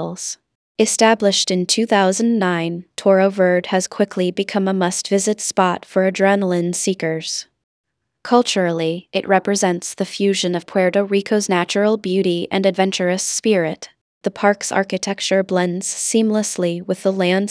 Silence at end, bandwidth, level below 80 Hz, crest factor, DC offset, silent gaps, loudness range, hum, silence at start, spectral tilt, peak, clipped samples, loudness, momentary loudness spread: 0 s; 11 kHz; -70 dBFS; 18 dB; under 0.1%; 0.55-0.75 s, 7.64-7.84 s, 14.01-14.21 s; 3 LU; none; 0 s; -4 dB/octave; 0 dBFS; under 0.1%; -18 LUFS; 8 LU